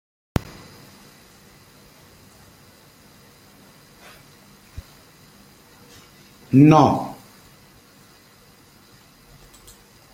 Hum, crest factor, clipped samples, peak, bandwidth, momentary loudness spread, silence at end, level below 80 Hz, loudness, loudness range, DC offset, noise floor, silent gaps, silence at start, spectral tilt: none; 24 dB; under 0.1%; -2 dBFS; 16.5 kHz; 33 LU; 3 s; -52 dBFS; -17 LUFS; 17 LU; under 0.1%; -51 dBFS; none; 4.75 s; -7.5 dB/octave